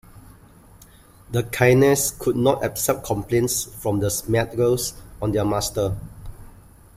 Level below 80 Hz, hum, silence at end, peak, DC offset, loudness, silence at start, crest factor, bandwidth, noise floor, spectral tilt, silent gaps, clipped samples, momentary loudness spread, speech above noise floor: -44 dBFS; none; 0.5 s; -4 dBFS; under 0.1%; -21 LUFS; 0.15 s; 20 dB; 16 kHz; -49 dBFS; -5 dB/octave; none; under 0.1%; 11 LU; 28 dB